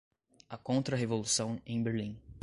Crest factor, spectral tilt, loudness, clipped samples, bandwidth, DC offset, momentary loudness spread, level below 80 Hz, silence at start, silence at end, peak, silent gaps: 16 dB; -4.5 dB/octave; -34 LUFS; under 0.1%; 11.5 kHz; under 0.1%; 13 LU; -62 dBFS; 0.5 s; 0.05 s; -18 dBFS; none